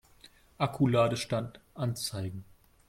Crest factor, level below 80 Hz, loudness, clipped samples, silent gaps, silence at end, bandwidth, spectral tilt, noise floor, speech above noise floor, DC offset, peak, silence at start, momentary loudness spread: 18 dB; -60 dBFS; -31 LUFS; under 0.1%; none; 0.45 s; 16 kHz; -6 dB/octave; -59 dBFS; 29 dB; under 0.1%; -14 dBFS; 0.6 s; 14 LU